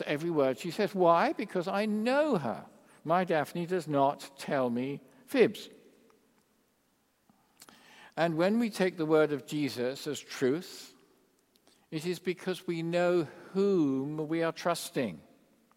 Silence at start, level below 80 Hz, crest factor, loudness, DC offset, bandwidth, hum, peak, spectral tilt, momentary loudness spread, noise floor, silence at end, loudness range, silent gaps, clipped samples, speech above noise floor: 0 s; -80 dBFS; 20 dB; -30 LUFS; under 0.1%; 16 kHz; none; -10 dBFS; -6 dB/octave; 11 LU; -72 dBFS; 0.55 s; 6 LU; none; under 0.1%; 42 dB